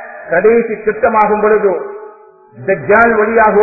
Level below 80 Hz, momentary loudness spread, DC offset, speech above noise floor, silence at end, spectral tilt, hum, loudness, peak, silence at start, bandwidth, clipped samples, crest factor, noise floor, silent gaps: -44 dBFS; 12 LU; under 0.1%; 25 dB; 0 s; -10 dB/octave; none; -11 LUFS; 0 dBFS; 0 s; 2.7 kHz; under 0.1%; 12 dB; -36 dBFS; none